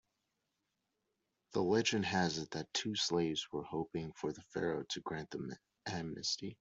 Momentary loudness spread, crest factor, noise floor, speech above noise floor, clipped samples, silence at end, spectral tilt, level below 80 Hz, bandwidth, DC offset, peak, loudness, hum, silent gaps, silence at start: 10 LU; 20 dB; -86 dBFS; 48 dB; under 0.1%; 0.05 s; -4 dB/octave; -72 dBFS; 8.2 kHz; under 0.1%; -20 dBFS; -38 LUFS; none; none; 1.5 s